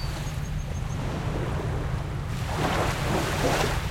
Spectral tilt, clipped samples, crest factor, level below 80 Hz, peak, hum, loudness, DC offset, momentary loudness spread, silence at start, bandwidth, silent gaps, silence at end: -5 dB/octave; under 0.1%; 14 dB; -34 dBFS; -12 dBFS; none; -28 LUFS; under 0.1%; 7 LU; 0 s; 16.5 kHz; none; 0 s